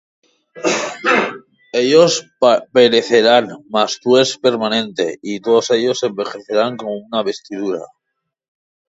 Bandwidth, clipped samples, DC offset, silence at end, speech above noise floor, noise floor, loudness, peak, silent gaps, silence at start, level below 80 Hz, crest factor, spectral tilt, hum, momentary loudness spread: 8 kHz; under 0.1%; under 0.1%; 1.15 s; 61 dB; -76 dBFS; -16 LUFS; 0 dBFS; none; 0.55 s; -64 dBFS; 16 dB; -3.5 dB/octave; none; 12 LU